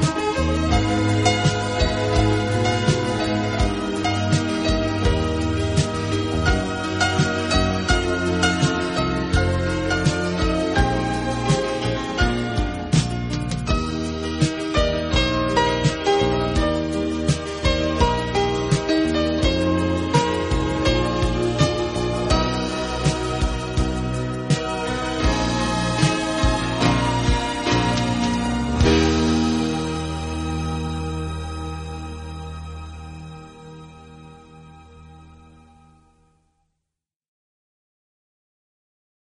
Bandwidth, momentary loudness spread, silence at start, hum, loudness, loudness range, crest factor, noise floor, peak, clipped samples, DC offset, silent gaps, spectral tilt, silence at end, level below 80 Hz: 10.5 kHz; 7 LU; 0 s; none; -21 LUFS; 7 LU; 18 dB; -83 dBFS; -2 dBFS; under 0.1%; under 0.1%; none; -5.5 dB/octave; 4 s; -30 dBFS